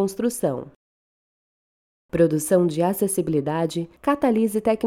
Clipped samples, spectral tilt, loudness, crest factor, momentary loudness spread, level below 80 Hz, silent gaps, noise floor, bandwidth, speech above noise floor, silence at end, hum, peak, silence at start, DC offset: under 0.1%; -6 dB/octave; -22 LUFS; 16 dB; 7 LU; -56 dBFS; 0.76-2.09 s; under -90 dBFS; 17 kHz; over 68 dB; 0 s; none; -6 dBFS; 0 s; under 0.1%